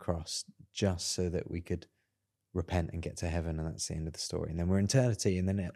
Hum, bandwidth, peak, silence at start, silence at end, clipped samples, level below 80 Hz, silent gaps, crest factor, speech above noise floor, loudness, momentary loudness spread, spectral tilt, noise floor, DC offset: none; 13 kHz; -14 dBFS; 0 s; 0.05 s; under 0.1%; -48 dBFS; none; 20 dB; 50 dB; -34 LUFS; 11 LU; -5 dB/octave; -83 dBFS; under 0.1%